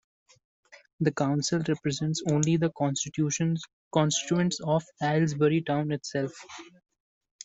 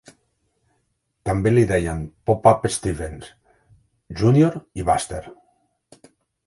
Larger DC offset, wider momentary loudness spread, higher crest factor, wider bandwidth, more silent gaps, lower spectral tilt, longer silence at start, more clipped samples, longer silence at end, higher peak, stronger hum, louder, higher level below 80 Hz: neither; second, 8 LU vs 16 LU; about the same, 20 dB vs 22 dB; second, 8.2 kHz vs 11.5 kHz; first, 3.73-3.91 s vs none; second, -5 dB/octave vs -6.5 dB/octave; second, 1 s vs 1.25 s; neither; second, 0.8 s vs 1.15 s; second, -10 dBFS vs 0 dBFS; neither; second, -28 LUFS vs -20 LUFS; second, -66 dBFS vs -42 dBFS